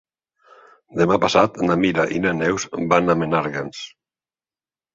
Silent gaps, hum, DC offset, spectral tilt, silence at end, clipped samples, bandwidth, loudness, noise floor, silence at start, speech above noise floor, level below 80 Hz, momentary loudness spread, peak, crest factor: none; none; under 0.1%; -5.5 dB/octave; 1.05 s; under 0.1%; 7.8 kHz; -19 LUFS; under -90 dBFS; 0.9 s; over 71 dB; -52 dBFS; 14 LU; -2 dBFS; 20 dB